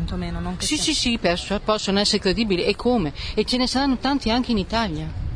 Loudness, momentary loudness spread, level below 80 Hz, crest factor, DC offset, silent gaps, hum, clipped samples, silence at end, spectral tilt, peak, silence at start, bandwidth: -22 LUFS; 7 LU; -34 dBFS; 16 dB; under 0.1%; none; none; under 0.1%; 0 s; -4 dB/octave; -6 dBFS; 0 s; 10.5 kHz